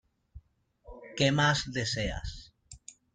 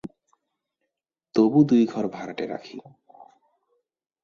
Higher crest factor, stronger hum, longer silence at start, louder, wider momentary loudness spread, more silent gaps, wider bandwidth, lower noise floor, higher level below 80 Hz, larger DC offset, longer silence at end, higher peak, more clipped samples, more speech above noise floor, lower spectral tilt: about the same, 22 dB vs 20 dB; neither; first, 0.35 s vs 0.05 s; second, -29 LUFS vs -22 LUFS; about the same, 25 LU vs 24 LU; neither; first, 9.4 kHz vs 7 kHz; second, -63 dBFS vs -84 dBFS; first, -48 dBFS vs -66 dBFS; neither; second, 0.25 s vs 1.45 s; second, -12 dBFS vs -6 dBFS; neither; second, 34 dB vs 62 dB; second, -4 dB/octave vs -8 dB/octave